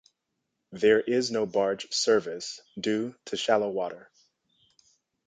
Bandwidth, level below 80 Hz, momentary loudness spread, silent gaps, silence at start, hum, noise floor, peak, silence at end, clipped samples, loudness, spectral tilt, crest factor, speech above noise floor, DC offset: 9.4 kHz; -72 dBFS; 13 LU; none; 0.7 s; none; -81 dBFS; -8 dBFS; 1.3 s; under 0.1%; -27 LUFS; -3.5 dB/octave; 20 dB; 54 dB; under 0.1%